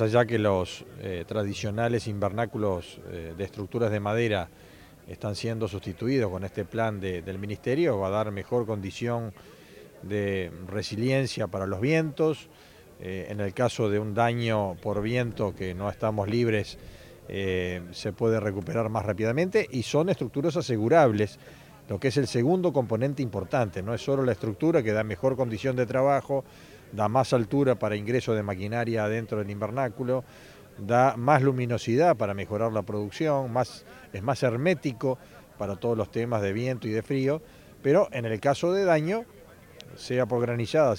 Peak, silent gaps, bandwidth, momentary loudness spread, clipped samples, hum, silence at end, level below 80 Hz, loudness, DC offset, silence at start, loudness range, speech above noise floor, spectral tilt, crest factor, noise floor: -6 dBFS; none; 17 kHz; 11 LU; under 0.1%; none; 0 s; -56 dBFS; -27 LUFS; under 0.1%; 0 s; 5 LU; 22 dB; -6.5 dB/octave; 22 dB; -49 dBFS